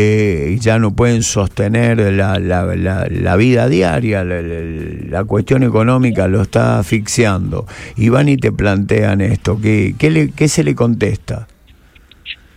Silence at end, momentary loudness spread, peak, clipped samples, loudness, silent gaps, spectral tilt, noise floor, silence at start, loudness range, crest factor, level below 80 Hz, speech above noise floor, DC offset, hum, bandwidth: 0.2 s; 10 LU; 0 dBFS; under 0.1%; -14 LUFS; none; -6.5 dB/octave; -45 dBFS; 0 s; 2 LU; 14 dB; -34 dBFS; 32 dB; under 0.1%; none; 14.5 kHz